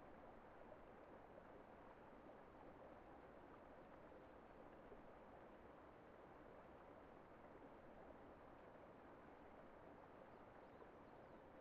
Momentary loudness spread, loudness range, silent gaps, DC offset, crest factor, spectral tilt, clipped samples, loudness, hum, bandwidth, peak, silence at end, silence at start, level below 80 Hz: 1 LU; 0 LU; none; under 0.1%; 16 dB; -5.5 dB/octave; under 0.1%; -64 LUFS; none; 4.8 kHz; -48 dBFS; 0 s; 0 s; -76 dBFS